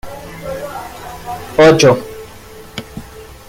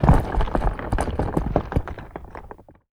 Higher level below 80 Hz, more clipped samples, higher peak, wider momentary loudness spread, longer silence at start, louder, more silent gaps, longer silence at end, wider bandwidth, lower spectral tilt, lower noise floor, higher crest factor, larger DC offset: second, -40 dBFS vs -26 dBFS; neither; about the same, 0 dBFS vs -2 dBFS; first, 25 LU vs 19 LU; about the same, 0.05 s vs 0 s; first, -12 LUFS vs -25 LUFS; neither; about the same, 0.25 s vs 0.35 s; first, 17 kHz vs 13 kHz; second, -5 dB/octave vs -8 dB/octave; second, -35 dBFS vs -43 dBFS; about the same, 16 dB vs 20 dB; neither